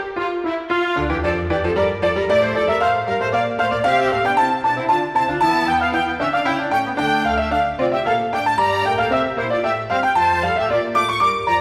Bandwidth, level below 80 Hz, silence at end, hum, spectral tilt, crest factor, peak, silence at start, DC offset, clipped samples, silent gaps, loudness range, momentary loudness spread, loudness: 14.5 kHz; -40 dBFS; 0 s; none; -5.5 dB/octave; 14 dB; -4 dBFS; 0 s; under 0.1%; under 0.1%; none; 1 LU; 4 LU; -19 LUFS